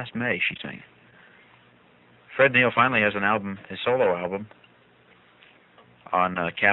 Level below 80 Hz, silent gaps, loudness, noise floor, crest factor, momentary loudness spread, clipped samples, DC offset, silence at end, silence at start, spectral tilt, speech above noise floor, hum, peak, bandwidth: -64 dBFS; none; -23 LUFS; -57 dBFS; 22 dB; 17 LU; under 0.1%; under 0.1%; 0 s; 0 s; -7.5 dB/octave; 33 dB; none; -4 dBFS; 4.2 kHz